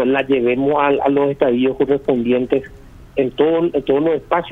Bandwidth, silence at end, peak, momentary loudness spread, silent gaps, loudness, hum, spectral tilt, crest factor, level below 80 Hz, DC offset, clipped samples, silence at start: 4 kHz; 0 s; -2 dBFS; 5 LU; none; -17 LUFS; none; -8 dB/octave; 16 dB; -46 dBFS; under 0.1%; under 0.1%; 0 s